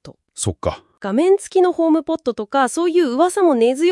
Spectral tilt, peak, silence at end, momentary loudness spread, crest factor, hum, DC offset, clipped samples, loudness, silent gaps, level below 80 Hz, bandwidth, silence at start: -5 dB/octave; -2 dBFS; 0 s; 10 LU; 14 dB; none; under 0.1%; under 0.1%; -18 LUFS; none; -50 dBFS; 12 kHz; 0.05 s